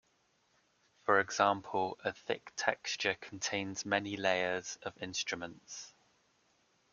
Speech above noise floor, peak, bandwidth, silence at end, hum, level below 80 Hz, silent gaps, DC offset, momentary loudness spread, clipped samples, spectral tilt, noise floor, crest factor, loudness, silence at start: 39 dB; -12 dBFS; 7.4 kHz; 1 s; none; -76 dBFS; none; under 0.1%; 12 LU; under 0.1%; -2.5 dB/octave; -74 dBFS; 26 dB; -35 LUFS; 1.05 s